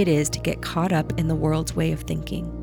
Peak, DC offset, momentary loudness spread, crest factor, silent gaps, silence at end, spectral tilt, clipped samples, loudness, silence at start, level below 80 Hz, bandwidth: -8 dBFS; under 0.1%; 6 LU; 14 dB; none; 0 s; -5.5 dB/octave; under 0.1%; -24 LUFS; 0 s; -38 dBFS; 18 kHz